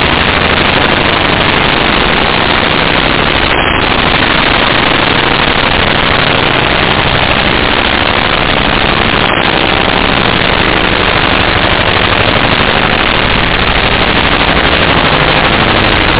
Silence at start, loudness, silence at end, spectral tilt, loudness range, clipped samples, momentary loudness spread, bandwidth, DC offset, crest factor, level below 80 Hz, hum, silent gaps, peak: 0 s; -8 LUFS; 0 s; -8.5 dB/octave; 1 LU; under 0.1%; 1 LU; 4 kHz; under 0.1%; 8 dB; -22 dBFS; none; none; 0 dBFS